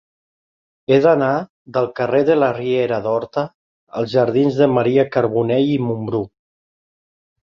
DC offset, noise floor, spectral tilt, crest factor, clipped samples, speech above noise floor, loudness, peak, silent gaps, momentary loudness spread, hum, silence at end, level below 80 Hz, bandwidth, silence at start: under 0.1%; under -90 dBFS; -8.5 dB/octave; 16 dB; under 0.1%; over 73 dB; -18 LUFS; -2 dBFS; 1.50-1.65 s, 3.54-3.87 s; 10 LU; none; 1.2 s; -58 dBFS; 7 kHz; 0.9 s